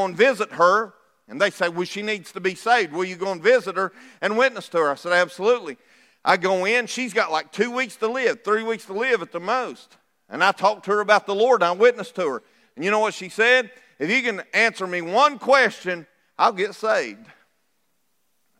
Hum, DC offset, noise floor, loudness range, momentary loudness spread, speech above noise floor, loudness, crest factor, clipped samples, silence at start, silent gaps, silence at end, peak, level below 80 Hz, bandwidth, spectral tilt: none; under 0.1%; -72 dBFS; 3 LU; 10 LU; 51 dB; -21 LUFS; 20 dB; under 0.1%; 0 s; none; 1.45 s; -2 dBFS; -84 dBFS; 14.5 kHz; -3.5 dB/octave